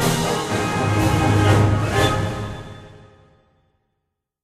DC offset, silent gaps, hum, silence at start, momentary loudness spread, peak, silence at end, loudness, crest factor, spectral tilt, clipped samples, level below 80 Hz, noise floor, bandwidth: under 0.1%; none; none; 0 s; 14 LU; -4 dBFS; 1.45 s; -19 LUFS; 16 dB; -5.5 dB/octave; under 0.1%; -36 dBFS; -77 dBFS; 15.5 kHz